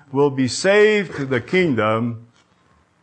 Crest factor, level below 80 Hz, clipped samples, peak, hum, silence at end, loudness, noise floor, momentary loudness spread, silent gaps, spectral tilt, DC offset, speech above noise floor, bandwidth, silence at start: 14 dB; -60 dBFS; under 0.1%; -4 dBFS; none; 0.8 s; -18 LUFS; -58 dBFS; 9 LU; none; -5 dB/octave; under 0.1%; 40 dB; 9.4 kHz; 0.1 s